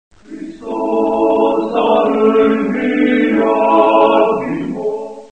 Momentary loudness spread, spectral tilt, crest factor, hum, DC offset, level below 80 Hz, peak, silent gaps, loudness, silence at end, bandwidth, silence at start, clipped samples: 12 LU; -7 dB/octave; 14 dB; none; 0.4%; -52 dBFS; 0 dBFS; none; -14 LUFS; 0.05 s; 8.4 kHz; 0.3 s; under 0.1%